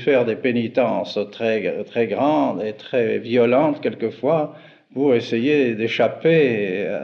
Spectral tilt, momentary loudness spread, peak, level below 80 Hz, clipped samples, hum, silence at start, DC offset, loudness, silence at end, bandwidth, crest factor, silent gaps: -7.5 dB/octave; 7 LU; -6 dBFS; -82 dBFS; under 0.1%; none; 0 s; under 0.1%; -20 LUFS; 0 s; 6.8 kHz; 14 dB; none